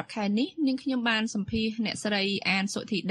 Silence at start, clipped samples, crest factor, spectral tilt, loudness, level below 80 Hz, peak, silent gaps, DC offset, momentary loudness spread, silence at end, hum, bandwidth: 0 s; under 0.1%; 18 dB; -4 dB/octave; -28 LUFS; -58 dBFS; -10 dBFS; none; under 0.1%; 4 LU; 0 s; none; 11.5 kHz